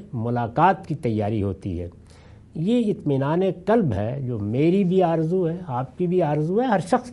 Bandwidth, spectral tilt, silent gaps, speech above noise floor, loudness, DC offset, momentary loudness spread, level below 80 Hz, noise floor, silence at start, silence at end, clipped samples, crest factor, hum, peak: 11.5 kHz; -8.5 dB/octave; none; 25 dB; -23 LUFS; under 0.1%; 9 LU; -54 dBFS; -47 dBFS; 0 s; 0 s; under 0.1%; 18 dB; none; -6 dBFS